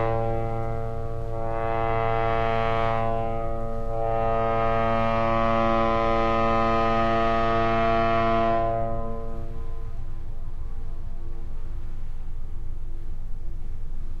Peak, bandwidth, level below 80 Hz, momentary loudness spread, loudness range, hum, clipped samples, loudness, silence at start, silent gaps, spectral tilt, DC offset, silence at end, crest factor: -10 dBFS; 6.2 kHz; -30 dBFS; 17 LU; 16 LU; none; under 0.1%; -25 LUFS; 0 s; none; -7.5 dB/octave; under 0.1%; 0 s; 14 dB